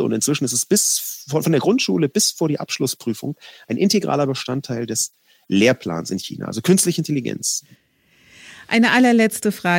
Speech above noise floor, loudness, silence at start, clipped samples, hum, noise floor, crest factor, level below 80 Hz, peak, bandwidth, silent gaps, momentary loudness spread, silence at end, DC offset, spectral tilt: 37 dB; -19 LUFS; 0 s; under 0.1%; none; -56 dBFS; 18 dB; -66 dBFS; -2 dBFS; 17 kHz; none; 10 LU; 0 s; under 0.1%; -4 dB/octave